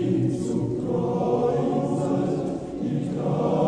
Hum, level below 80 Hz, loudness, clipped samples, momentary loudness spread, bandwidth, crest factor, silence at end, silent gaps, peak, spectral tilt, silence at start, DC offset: none; -52 dBFS; -25 LUFS; under 0.1%; 5 LU; 10 kHz; 14 dB; 0 s; none; -10 dBFS; -8.5 dB/octave; 0 s; under 0.1%